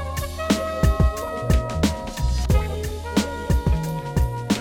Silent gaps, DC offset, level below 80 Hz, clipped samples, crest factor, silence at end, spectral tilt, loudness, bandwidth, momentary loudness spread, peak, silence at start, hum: none; under 0.1%; -26 dBFS; under 0.1%; 14 dB; 0 s; -6 dB/octave; -23 LUFS; 17.5 kHz; 7 LU; -6 dBFS; 0 s; none